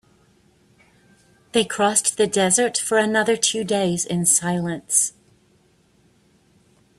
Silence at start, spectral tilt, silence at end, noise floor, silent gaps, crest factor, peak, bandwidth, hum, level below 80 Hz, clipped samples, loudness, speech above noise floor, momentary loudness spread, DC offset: 1.55 s; -2.5 dB/octave; 1.9 s; -59 dBFS; none; 20 dB; -2 dBFS; 15.5 kHz; none; -62 dBFS; under 0.1%; -19 LUFS; 39 dB; 6 LU; under 0.1%